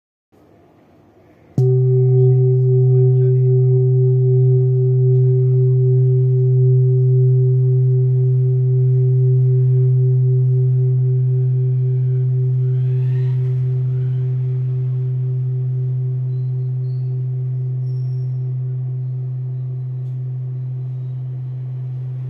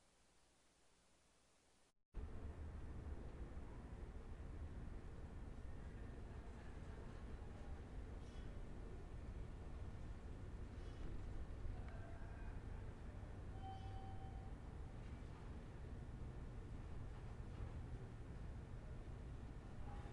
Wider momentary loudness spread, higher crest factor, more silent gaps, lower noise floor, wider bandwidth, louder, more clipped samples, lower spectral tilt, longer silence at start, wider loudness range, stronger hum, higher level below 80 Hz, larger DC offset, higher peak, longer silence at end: first, 11 LU vs 3 LU; second, 10 dB vs 16 dB; second, none vs 2.05-2.12 s; second, -50 dBFS vs -76 dBFS; second, 0.9 kHz vs 11 kHz; first, -17 LUFS vs -55 LUFS; neither; first, -13.5 dB/octave vs -7.5 dB/octave; first, 1.55 s vs 0 s; first, 9 LU vs 2 LU; neither; second, -62 dBFS vs -54 dBFS; neither; first, -4 dBFS vs -36 dBFS; about the same, 0 s vs 0 s